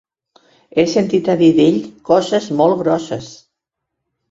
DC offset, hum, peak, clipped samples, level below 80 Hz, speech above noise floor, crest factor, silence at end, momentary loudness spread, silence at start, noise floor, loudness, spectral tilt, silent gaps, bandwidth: under 0.1%; none; -2 dBFS; under 0.1%; -56 dBFS; 64 dB; 16 dB; 0.95 s; 11 LU; 0.75 s; -78 dBFS; -15 LUFS; -6 dB/octave; none; 7.8 kHz